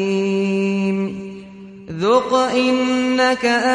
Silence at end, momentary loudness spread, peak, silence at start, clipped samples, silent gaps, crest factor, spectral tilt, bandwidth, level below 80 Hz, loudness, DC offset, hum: 0 s; 18 LU; -4 dBFS; 0 s; under 0.1%; none; 14 dB; -5.5 dB/octave; 10.5 kHz; -56 dBFS; -18 LUFS; under 0.1%; none